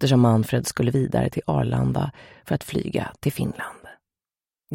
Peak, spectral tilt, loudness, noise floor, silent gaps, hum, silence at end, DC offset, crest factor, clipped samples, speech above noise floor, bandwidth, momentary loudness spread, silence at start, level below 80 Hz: -6 dBFS; -6.5 dB/octave; -24 LUFS; under -90 dBFS; none; none; 0 s; under 0.1%; 18 dB; under 0.1%; over 68 dB; 17 kHz; 10 LU; 0 s; -48 dBFS